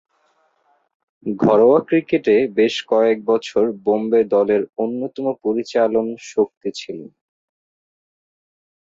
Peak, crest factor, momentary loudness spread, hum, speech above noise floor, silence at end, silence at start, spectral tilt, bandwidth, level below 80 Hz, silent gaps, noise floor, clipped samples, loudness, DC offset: -4 dBFS; 16 dB; 14 LU; none; 45 dB; 1.95 s; 1.25 s; -6 dB/octave; 7.8 kHz; -62 dBFS; 6.57-6.61 s; -63 dBFS; under 0.1%; -18 LUFS; under 0.1%